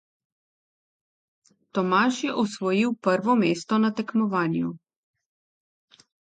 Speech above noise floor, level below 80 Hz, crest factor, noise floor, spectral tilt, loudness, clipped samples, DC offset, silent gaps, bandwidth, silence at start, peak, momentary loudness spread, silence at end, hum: over 67 dB; -74 dBFS; 18 dB; under -90 dBFS; -6 dB/octave; -24 LUFS; under 0.1%; under 0.1%; none; 9.2 kHz; 1.75 s; -8 dBFS; 6 LU; 1.45 s; none